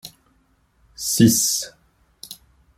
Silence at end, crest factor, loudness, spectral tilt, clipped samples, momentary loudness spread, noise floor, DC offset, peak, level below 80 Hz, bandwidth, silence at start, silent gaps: 0.45 s; 20 dB; -18 LUFS; -3.5 dB/octave; under 0.1%; 25 LU; -62 dBFS; under 0.1%; -2 dBFS; -54 dBFS; 16.5 kHz; 0.05 s; none